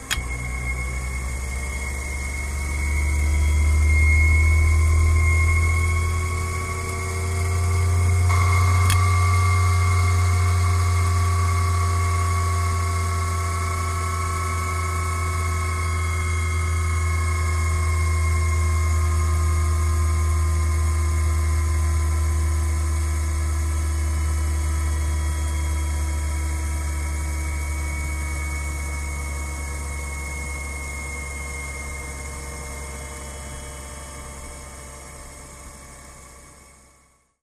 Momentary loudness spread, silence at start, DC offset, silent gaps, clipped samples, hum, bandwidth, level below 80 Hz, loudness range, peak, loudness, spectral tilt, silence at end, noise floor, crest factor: 14 LU; 0 s; under 0.1%; none; under 0.1%; none; 13.5 kHz; -26 dBFS; 13 LU; -6 dBFS; -23 LUFS; -4.5 dB/octave; 0.95 s; -59 dBFS; 16 dB